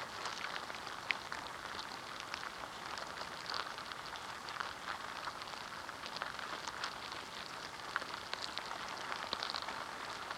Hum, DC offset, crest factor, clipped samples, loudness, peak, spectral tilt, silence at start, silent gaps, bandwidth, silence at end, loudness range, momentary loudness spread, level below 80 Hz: none; under 0.1%; 30 dB; under 0.1%; -43 LUFS; -14 dBFS; -1.5 dB/octave; 0 s; none; 17 kHz; 0 s; 2 LU; 5 LU; -70 dBFS